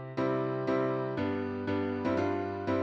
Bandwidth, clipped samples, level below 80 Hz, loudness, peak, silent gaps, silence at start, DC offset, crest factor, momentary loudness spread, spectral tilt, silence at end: 7.6 kHz; under 0.1%; -66 dBFS; -32 LUFS; -18 dBFS; none; 0 s; under 0.1%; 12 dB; 3 LU; -8.5 dB/octave; 0 s